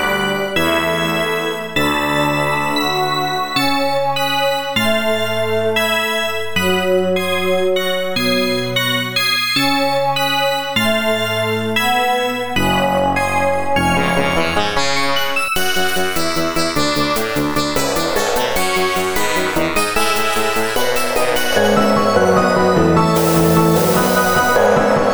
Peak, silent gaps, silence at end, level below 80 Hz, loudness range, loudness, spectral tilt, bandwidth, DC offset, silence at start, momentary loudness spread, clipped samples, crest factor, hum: 0 dBFS; none; 0 s; -40 dBFS; 3 LU; -16 LUFS; -4 dB/octave; over 20 kHz; under 0.1%; 0 s; 4 LU; under 0.1%; 16 dB; none